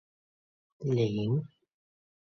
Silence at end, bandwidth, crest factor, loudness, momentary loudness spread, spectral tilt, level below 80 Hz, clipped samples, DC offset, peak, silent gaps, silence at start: 0.8 s; 6.6 kHz; 16 dB; -31 LUFS; 11 LU; -8.5 dB/octave; -66 dBFS; under 0.1%; under 0.1%; -18 dBFS; none; 0.8 s